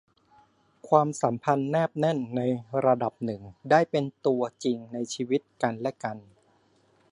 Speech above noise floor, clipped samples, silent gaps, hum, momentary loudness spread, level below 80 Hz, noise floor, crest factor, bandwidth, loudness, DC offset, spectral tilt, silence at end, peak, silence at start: 38 dB; under 0.1%; none; none; 11 LU; -70 dBFS; -65 dBFS; 22 dB; 11.5 kHz; -27 LUFS; under 0.1%; -6 dB/octave; 0.9 s; -6 dBFS; 0.85 s